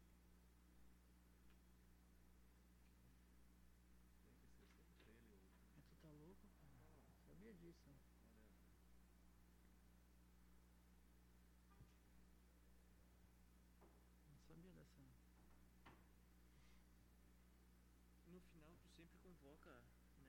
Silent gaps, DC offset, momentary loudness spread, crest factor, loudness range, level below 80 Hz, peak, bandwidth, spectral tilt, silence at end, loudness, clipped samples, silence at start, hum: none; under 0.1%; 3 LU; 16 dB; 1 LU; -74 dBFS; -52 dBFS; 17 kHz; -5.5 dB/octave; 0 s; -68 LUFS; under 0.1%; 0 s; 60 Hz at -75 dBFS